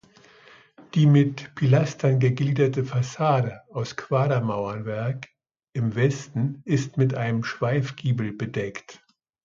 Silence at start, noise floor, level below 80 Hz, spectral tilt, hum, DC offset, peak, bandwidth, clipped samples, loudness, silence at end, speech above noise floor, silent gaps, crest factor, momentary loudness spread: 0.8 s; -53 dBFS; -60 dBFS; -7.5 dB/octave; none; under 0.1%; -6 dBFS; 7.4 kHz; under 0.1%; -24 LUFS; 0.5 s; 30 dB; none; 18 dB; 10 LU